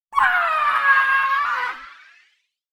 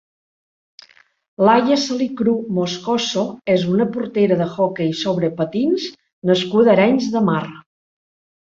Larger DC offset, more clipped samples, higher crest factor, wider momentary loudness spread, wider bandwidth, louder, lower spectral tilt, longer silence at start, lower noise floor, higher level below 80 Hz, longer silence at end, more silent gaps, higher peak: neither; neither; about the same, 16 dB vs 18 dB; about the same, 10 LU vs 8 LU; first, 17.5 kHz vs 7.8 kHz; about the same, -18 LUFS vs -18 LUFS; second, -0.5 dB/octave vs -6 dB/octave; second, 0.1 s vs 1.4 s; first, -64 dBFS vs -48 dBFS; about the same, -60 dBFS vs -60 dBFS; about the same, 0.8 s vs 0.85 s; second, none vs 6.13-6.22 s; about the same, -4 dBFS vs -2 dBFS